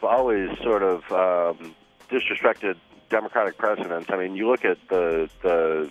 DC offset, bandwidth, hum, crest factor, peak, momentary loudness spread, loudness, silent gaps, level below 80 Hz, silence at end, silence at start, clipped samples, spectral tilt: under 0.1%; 8.6 kHz; none; 20 dB; -4 dBFS; 6 LU; -24 LUFS; none; -54 dBFS; 0 s; 0 s; under 0.1%; -6 dB/octave